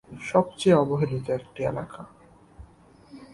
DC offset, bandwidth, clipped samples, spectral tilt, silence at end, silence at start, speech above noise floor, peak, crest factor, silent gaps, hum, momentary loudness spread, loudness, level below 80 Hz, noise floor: under 0.1%; 11.5 kHz; under 0.1%; -7 dB/octave; 0.1 s; 0.1 s; 29 dB; -6 dBFS; 20 dB; none; none; 15 LU; -25 LUFS; -56 dBFS; -53 dBFS